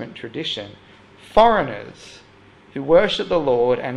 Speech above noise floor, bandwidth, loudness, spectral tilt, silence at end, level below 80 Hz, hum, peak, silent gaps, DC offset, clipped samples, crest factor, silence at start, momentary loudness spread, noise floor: 29 dB; 10 kHz; -19 LUFS; -5.5 dB/octave; 0 s; -46 dBFS; none; -2 dBFS; none; under 0.1%; under 0.1%; 20 dB; 0 s; 19 LU; -49 dBFS